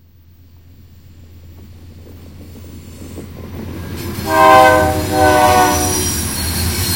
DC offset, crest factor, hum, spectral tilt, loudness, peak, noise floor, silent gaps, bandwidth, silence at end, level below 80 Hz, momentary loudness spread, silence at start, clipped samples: 0.4%; 16 dB; none; -3.5 dB/octave; -12 LUFS; 0 dBFS; -45 dBFS; none; 17 kHz; 0 s; -36 dBFS; 26 LU; 1.35 s; 0.1%